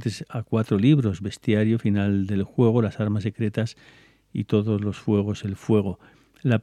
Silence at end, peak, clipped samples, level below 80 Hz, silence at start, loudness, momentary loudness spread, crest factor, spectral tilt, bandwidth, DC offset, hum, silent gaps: 0 s; -6 dBFS; under 0.1%; -58 dBFS; 0 s; -24 LUFS; 10 LU; 18 dB; -8 dB/octave; 10.5 kHz; under 0.1%; none; none